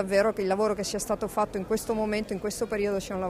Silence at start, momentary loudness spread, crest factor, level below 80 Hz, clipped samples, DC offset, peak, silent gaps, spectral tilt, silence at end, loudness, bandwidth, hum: 0 s; 5 LU; 16 dB; -50 dBFS; under 0.1%; under 0.1%; -12 dBFS; none; -4.5 dB/octave; 0 s; -28 LUFS; 16 kHz; none